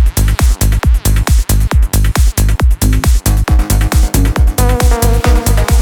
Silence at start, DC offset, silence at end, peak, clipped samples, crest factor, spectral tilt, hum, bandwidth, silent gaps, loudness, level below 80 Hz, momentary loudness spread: 0 s; under 0.1%; 0 s; 0 dBFS; under 0.1%; 10 dB; -5 dB/octave; none; 18 kHz; none; -12 LUFS; -10 dBFS; 1 LU